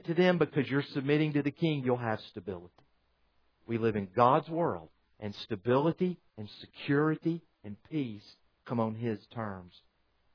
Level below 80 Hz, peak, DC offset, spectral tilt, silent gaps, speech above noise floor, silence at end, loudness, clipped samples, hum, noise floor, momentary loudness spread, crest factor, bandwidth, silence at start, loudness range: -70 dBFS; -10 dBFS; under 0.1%; -8.5 dB/octave; none; 41 dB; 0.65 s; -31 LUFS; under 0.1%; none; -72 dBFS; 17 LU; 22 dB; 5.4 kHz; 0.05 s; 4 LU